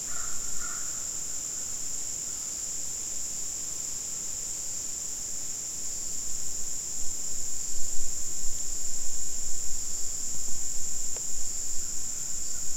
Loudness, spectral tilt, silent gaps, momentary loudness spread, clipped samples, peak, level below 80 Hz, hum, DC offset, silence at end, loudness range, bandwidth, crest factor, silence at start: -31 LUFS; -0.5 dB/octave; none; 1 LU; under 0.1%; -10 dBFS; -42 dBFS; none; 0.8%; 0 s; 1 LU; 16.5 kHz; 14 dB; 0 s